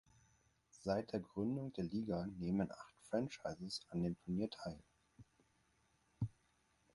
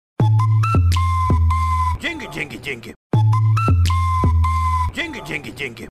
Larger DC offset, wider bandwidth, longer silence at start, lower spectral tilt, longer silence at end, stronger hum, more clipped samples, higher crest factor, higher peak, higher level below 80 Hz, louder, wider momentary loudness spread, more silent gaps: neither; about the same, 11.5 kHz vs 12.5 kHz; first, 0.75 s vs 0.2 s; about the same, -7 dB/octave vs -6.5 dB/octave; first, 0.65 s vs 0 s; neither; neither; first, 20 dB vs 8 dB; second, -24 dBFS vs -10 dBFS; second, -68 dBFS vs -30 dBFS; second, -43 LUFS vs -19 LUFS; second, 7 LU vs 11 LU; second, none vs 2.96-3.10 s